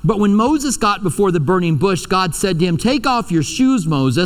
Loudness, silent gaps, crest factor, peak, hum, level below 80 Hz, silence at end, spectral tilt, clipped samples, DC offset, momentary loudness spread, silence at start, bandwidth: -16 LUFS; none; 14 dB; -2 dBFS; none; -38 dBFS; 0 s; -5.5 dB/octave; under 0.1%; under 0.1%; 3 LU; 0 s; 16 kHz